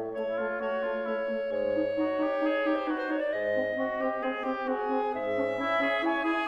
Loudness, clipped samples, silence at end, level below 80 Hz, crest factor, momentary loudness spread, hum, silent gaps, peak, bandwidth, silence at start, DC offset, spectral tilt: -29 LUFS; under 0.1%; 0 s; -64 dBFS; 12 dB; 4 LU; none; none; -16 dBFS; 7.6 kHz; 0 s; under 0.1%; -6 dB/octave